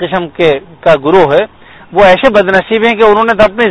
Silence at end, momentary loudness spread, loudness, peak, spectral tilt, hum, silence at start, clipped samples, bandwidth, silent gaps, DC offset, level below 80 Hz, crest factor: 0 s; 6 LU; -8 LUFS; 0 dBFS; -6 dB/octave; none; 0 s; 2%; 11 kHz; none; under 0.1%; -36 dBFS; 8 dB